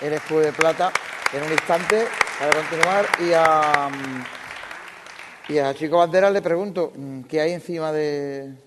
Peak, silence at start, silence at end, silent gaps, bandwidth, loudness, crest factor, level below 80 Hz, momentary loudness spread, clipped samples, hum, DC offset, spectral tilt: -4 dBFS; 0 s; 0.1 s; none; 12.5 kHz; -21 LUFS; 18 dB; -64 dBFS; 17 LU; under 0.1%; none; under 0.1%; -4 dB/octave